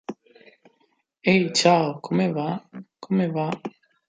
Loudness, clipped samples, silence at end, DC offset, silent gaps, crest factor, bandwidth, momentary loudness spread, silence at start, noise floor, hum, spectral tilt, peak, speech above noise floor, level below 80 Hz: -23 LUFS; under 0.1%; 0.4 s; under 0.1%; none; 20 dB; 9.4 kHz; 21 LU; 0.1 s; -68 dBFS; none; -5 dB/octave; -4 dBFS; 46 dB; -70 dBFS